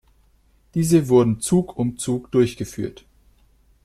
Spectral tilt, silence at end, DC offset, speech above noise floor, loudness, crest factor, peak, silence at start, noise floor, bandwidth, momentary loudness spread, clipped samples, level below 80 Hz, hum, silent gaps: -6.5 dB/octave; 0.95 s; under 0.1%; 39 dB; -21 LUFS; 18 dB; -4 dBFS; 0.75 s; -58 dBFS; 14.5 kHz; 13 LU; under 0.1%; -50 dBFS; none; none